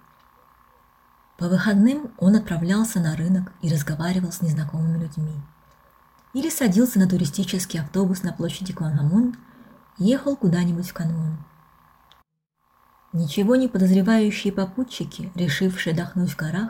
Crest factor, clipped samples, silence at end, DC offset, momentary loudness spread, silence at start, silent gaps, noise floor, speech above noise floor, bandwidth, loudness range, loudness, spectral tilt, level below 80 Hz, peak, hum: 16 dB; under 0.1%; 0 s; under 0.1%; 10 LU; 1.4 s; none; -70 dBFS; 49 dB; 17 kHz; 4 LU; -22 LUFS; -6.5 dB/octave; -54 dBFS; -8 dBFS; none